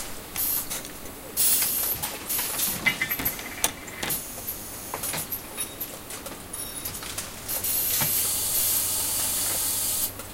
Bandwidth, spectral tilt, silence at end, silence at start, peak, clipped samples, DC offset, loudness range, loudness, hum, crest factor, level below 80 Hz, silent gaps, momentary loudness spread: 17 kHz; -0.5 dB/octave; 0 s; 0 s; -4 dBFS; under 0.1%; under 0.1%; 8 LU; -25 LUFS; none; 24 dB; -50 dBFS; none; 12 LU